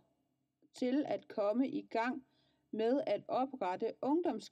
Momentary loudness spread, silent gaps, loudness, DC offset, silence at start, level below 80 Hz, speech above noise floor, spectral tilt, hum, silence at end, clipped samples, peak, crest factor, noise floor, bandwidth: 5 LU; none; -37 LUFS; under 0.1%; 0.75 s; -86 dBFS; 46 dB; -6 dB/octave; none; 0.05 s; under 0.1%; -22 dBFS; 14 dB; -82 dBFS; 9.2 kHz